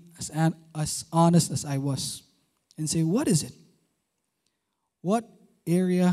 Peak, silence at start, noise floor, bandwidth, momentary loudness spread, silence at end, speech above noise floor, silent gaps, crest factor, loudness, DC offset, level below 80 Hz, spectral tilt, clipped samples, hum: -8 dBFS; 0.2 s; -80 dBFS; 14.5 kHz; 13 LU; 0 s; 55 dB; none; 18 dB; -26 LUFS; under 0.1%; -60 dBFS; -5.5 dB/octave; under 0.1%; none